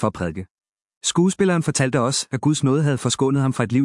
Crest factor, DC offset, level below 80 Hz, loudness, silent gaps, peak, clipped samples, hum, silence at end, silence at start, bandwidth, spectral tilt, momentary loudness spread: 16 dB; under 0.1%; -56 dBFS; -20 LUFS; 0.50-0.56 s, 0.97-1.01 s; -4 dBFS; under 0.1%; none; 0 s; 0 s; 12 kHz; -5 dB/octave; 7 LU